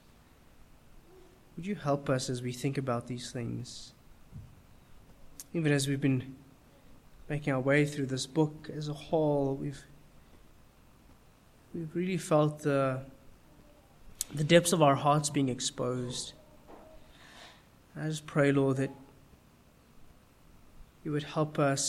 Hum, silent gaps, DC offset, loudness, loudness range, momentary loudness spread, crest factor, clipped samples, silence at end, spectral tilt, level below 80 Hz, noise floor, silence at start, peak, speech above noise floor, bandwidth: none; none; under 0.1%; -31 LUFS; 7 LU; 23 LU; 24 dB; under 0.1%; 0 s; -5 dB/octave; -60 dBFS; -61 dBFS; 0.95 s; -10 dBFS; 30 dB; 15 kHz